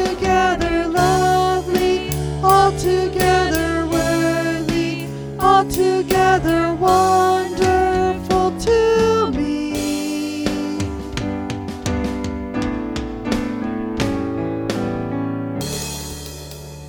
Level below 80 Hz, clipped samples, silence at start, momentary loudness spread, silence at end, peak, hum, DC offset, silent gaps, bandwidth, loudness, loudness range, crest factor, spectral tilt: -34 dBFS; under 0.1%; 0 s; 10 LU; 0 s; -2 dBFS; none; under 0.1%; none; over 20 kHz; -19 LUFS; 8 LU; 16 dB; -5 dB/octave